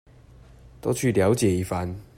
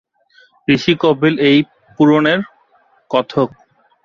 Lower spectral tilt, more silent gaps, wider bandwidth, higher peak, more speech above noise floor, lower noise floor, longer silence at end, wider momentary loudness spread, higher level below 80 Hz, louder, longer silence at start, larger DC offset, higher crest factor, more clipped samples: about the same, -6 dB/octave vs -6.5 dB/octave; neither; first, 16 kHz vs 7 kHz; second, -8 dBFS vs -2 dBFS; second, 26 dB vs 42 dB; second, -50 dBFS vs -55 dBFS; second, 0.15 s vs 0.55 s; about the same, 9 LU vs 11 LU; about the same, -52 dBFS vs -54 dBFS; second, -24 LUFS vs -15 LUFS; first, 0.85 s vs 0.7 s; neither; about the same, 16 dB vs 14 dB; neither